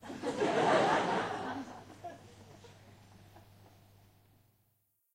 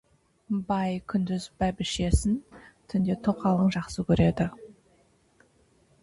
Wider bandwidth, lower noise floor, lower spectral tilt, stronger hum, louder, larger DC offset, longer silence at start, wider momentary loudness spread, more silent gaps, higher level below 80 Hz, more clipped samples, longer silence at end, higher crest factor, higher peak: first, 16 kHz vs 11.5 kHz; first, -77 dBFS vs -64 dBFS; second, -4.5 dB/octave vs -6.5 dB/octave; neither; second, -32 LUFS vs -27 LUFS; neither; second, 0.05 s vs 0.5 s; first, 27 LU vs 8 LU; neither; second, -72 dBFS vs -40 dBFS; neither; first, 1.75 s vs 1.3 s; about the same, 22 dB vs 18 dB; second, -16 dBFS vs -10 dBFS